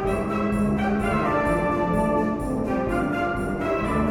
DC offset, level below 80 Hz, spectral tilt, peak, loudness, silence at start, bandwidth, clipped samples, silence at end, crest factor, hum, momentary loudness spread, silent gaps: under 0.1%; -36 dBFS; -7.5 dB/octave; -10 dBFS; -24 LUFS; 0 s; 17 kHz; under 0.1%; 0 s; 12 dB; none; 3 LU; none